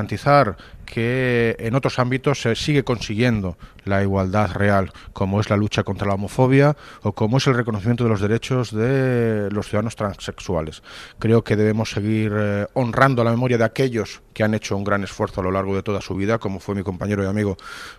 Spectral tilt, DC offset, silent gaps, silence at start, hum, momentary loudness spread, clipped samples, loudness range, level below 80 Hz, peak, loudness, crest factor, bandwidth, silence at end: -6.5 dB/octave; under 0.1%; none; 0 s; none; 9 LU; under 0.1%; 3 LU; -44 dBFS; 0 dBFS; -21 LUFS; 20 dB; 13.5 kHz; 0.05 s